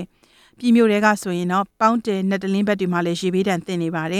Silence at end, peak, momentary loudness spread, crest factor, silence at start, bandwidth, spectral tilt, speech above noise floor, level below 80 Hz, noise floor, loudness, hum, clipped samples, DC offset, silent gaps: 0 s; -2 dBFS; 7 LU; 18 dB; 0 s; 15 kHz; -6 dB/octave; 36 dB; -62 dBFS; -55 dBFS; -20 LUFS; none; under 0.1%; under 0.1%; none